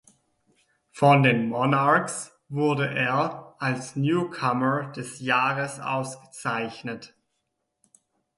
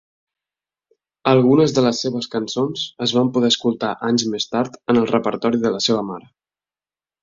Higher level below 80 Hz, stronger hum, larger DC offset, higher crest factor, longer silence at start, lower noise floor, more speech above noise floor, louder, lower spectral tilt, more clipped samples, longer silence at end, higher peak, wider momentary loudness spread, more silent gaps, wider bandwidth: second, -68 dBFS vs -60 dBFS; neither; neither; about the same, 20 dB vs 18 dB; second, 0.95 s vs 1.25 s; second, -78 dBFS vs under -90 dBFS; second, 54 dB vs over 72 dB; second, -24 LUFS vs -19 LUFS; about the same, -5.5 dB/octave vs -5 dB/octave; neither; first, 1.3 s vs 1 s; second, -6 dBFS vs -2 dBFS; first, 14 LU vs 9 LU; neither; first, 11.5 kHz vs 7.6 kHz